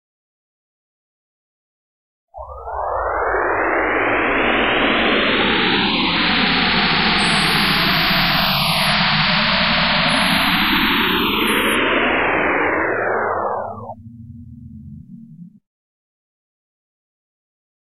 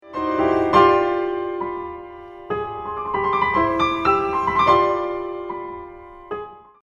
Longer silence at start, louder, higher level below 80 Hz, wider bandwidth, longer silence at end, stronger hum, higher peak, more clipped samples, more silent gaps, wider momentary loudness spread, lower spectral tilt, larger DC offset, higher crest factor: first, 2.35 s vs 0.05 s; first, -16 LUFS vs -20 LUFS; first, -40 dBFS vs -46 dBFS; first, 15.5 kHz vs 7.2 kHz; first, 2.25 s vs 0.2 s; neither; about the same, -2 dBFS vs -2 dBFS; neither; neither; second, 7 LU vs 18 LU; second, -4 dB/octave vs -6.5 dB/octave; first, 0.9% vs under 0.1%; about the same, 16 dB vs 20 dB